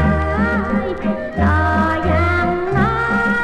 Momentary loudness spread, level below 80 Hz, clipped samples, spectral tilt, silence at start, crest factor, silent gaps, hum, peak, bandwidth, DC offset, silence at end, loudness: 5 LU; -28 dBFS; under 0.1%; -8 dB/octave; 0 s; 14 dB; none; none; -2 dBFS; 9 kHz; under 0.1%; 0 s; -17 LUFS